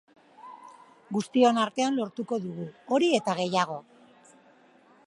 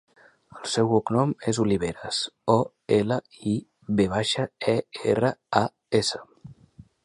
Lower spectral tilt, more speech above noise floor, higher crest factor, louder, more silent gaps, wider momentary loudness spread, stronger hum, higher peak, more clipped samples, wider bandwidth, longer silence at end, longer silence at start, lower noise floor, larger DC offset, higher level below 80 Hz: about the same, -5 dB/octave vs -5 dB/octave; first, 32 dB vs 28 dB; about the same, 20 dB vs 22 dB; about the same, -27 LUFS vs -25 LUFS; neither; first, 22 LU vs 6 LU; neither; second, -8 dBFS vs -2 dBFS; neither; about the same, 11.5 kHz vs 11.5 kHz; first, 1.25 s vs 0.5 s; second, 0.4 s vs 0.55 s; first, -58 dBFS vs -52 dBFS; neither; second, -78 dBFS vs -56 dBFS